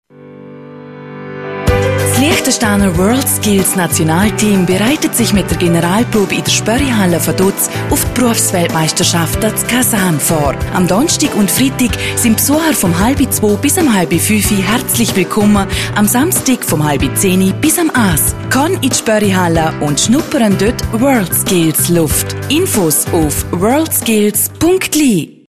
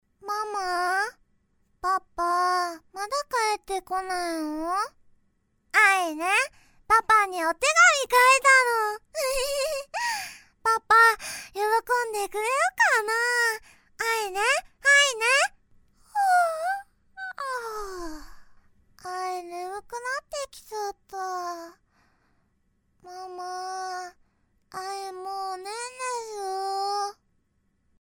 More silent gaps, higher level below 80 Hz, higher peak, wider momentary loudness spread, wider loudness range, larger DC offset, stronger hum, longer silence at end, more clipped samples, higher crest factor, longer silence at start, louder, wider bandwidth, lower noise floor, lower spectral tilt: neither; first, -30 dBFS vs -56 dBFS; first, 0 dBFS vs -6 dBFS; second, 3 LU vs 18 LU; second, 1 LU vs 16 LU; first, 0.3% vs under 0.1%; neither; second, 0.2 s vs 0.9 s; neither; second, 12 dB vs 20 dB; about the same, 0.2 s vs 0.25 s; first, -11 LUFS vs -24 LUFS; second, 14.5 kHz vs 19 kHz; second, -34 dBFS vs -70 dBFS; first, -4 dB/octave vs 0 dB/octave